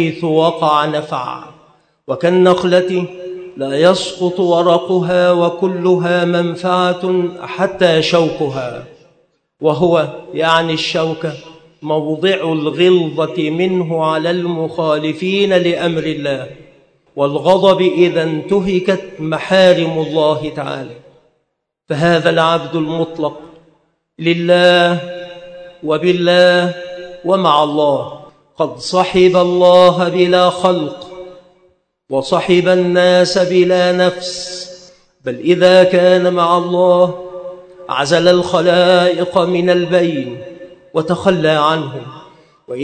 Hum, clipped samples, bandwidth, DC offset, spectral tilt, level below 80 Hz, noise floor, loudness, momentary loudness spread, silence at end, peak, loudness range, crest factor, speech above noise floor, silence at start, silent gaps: none; 0.1%; 9.2 kHz; under 0.1%; -5.5 dB/octave; -54 dBFS; -70 dBFS; -13 LUFS; 15 LU; 0 s; 0 dBFS; 4 LU; 14 dB; 57 dB; 0 s; none